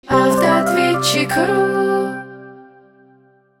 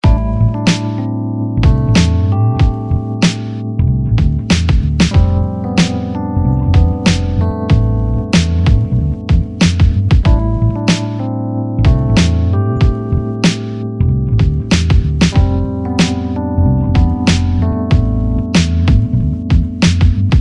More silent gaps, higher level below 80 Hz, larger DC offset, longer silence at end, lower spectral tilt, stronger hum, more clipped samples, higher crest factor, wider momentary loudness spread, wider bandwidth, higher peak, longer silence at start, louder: neither; second, -52 dBFS vs -18 dBFS; second, under 0.1% vs 0.1%; first, 0.95 s vs 0 s; second, -4.5 dB/octave vs -6.5 dB/octave; neither; neither; about the same, 16 dB vs 12 dB; first, 10 LU vs 6 LU; first, 17 kHz vs 11 kHz; about the same, -2 dBFS vs 0 dBFS; about the same, 0.05 s vs 0.05 s; about the same, -16 LUFS vs -14 LUFS